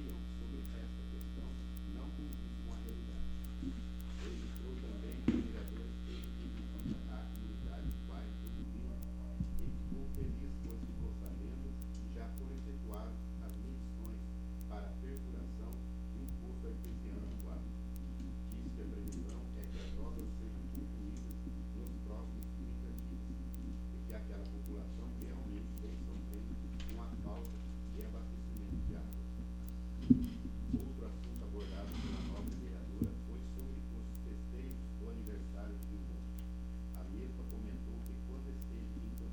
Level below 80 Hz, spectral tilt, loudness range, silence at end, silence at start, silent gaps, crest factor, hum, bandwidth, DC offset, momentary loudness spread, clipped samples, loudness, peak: -44 dBFS; -7.5 dB/octave; 6 LU; 0 s; 0 s; none; 28 dB; none; 19.5 kHz; under 0.1%; 3 LU; under 0.1%; -44 LUFS; -14 dBFS